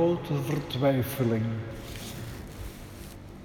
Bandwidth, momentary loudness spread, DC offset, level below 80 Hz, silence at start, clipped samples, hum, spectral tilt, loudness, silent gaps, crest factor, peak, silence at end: over 20 kHz; 17 LU; under 0.1%; -48 dBFS; 0 s; under 0.1%; none; -6.5 dB/octave; -30 LUFS; none; 16 dB; -12 dBFS; 0 s